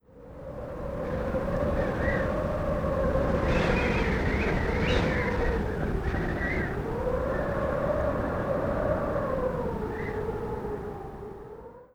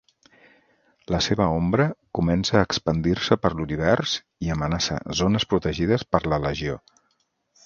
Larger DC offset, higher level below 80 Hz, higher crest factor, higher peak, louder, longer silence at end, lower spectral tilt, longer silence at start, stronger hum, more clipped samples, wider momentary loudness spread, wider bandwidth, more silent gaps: neither; first, -36 dBFS vs -42 dBFS; second, 16 dB vs 22 dB; second, -12 dBFS vs -2 dBFS; second, -29 LUFS vs -23 LUFS; second, 0.1 s vs 0.85 s; first, -7.5 dB/octave vs -5.5 dB/octave; second, 0.15 s vs 1.1 s; neither; neither; first, 13 LU vs 6 LU; first, 15.5 kHz vs 7.4 kHz; neither